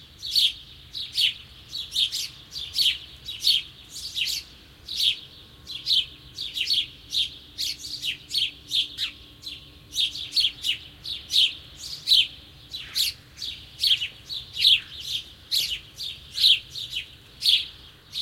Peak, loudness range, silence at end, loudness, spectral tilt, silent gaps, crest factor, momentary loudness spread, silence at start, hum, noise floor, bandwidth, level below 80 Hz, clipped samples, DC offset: -6 dBFS; 4 LU; 0 s; -24 LUFS; 1 dB/octave; none; 22 dB; 17 LU; 0 s; none; -46 dBFS; 16.5 kHz; -56 dBFS; under 0.1%; under 0.1%